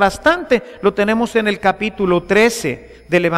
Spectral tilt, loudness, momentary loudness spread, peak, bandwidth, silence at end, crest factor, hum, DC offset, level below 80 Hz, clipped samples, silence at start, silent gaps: -5 dB/octave; -16 LUFS; 6 LU; -2 dBFS; 15.5 kHz; 0 s; 14 dB; none; under 0.1%; -42 dBFS; under 0.1%; 0 s; none